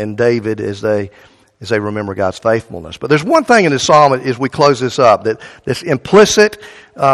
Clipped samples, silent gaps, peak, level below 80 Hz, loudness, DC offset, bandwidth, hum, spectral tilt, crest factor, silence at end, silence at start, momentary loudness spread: 0.3%; none; 0 dBFS; -48 dBFS; -13 LUFS; under 0.1%; 13 kHz; none; -4.5 dB/octave; 14 dB; 0 s; 0 s; 12 LU